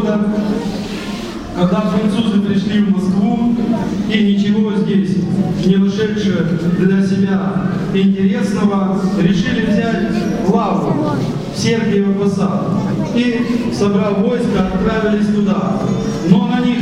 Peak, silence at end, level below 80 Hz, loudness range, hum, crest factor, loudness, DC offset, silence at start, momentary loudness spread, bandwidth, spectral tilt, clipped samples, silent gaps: 0 dBFS; 0 s; -38 dBFS; 1 LU; none; 14 dB; -15 LUFS; under 0.1%; 0 s; 4 LU; 10.5 kHz; -7 dB/octave; under 0.1%; none